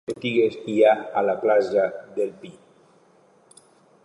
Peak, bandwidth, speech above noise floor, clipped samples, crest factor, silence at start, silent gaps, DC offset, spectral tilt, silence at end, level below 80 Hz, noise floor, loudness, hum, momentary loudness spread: -6 dBFS; 11 kHz; 35 dB; under 0.1%; 18 dB; 0.1 s; none; under 0.1%; -6 dB/octave; 1.55 s; -72 dBFS; -57 dBFS; -22 LUFS; none; 10 LU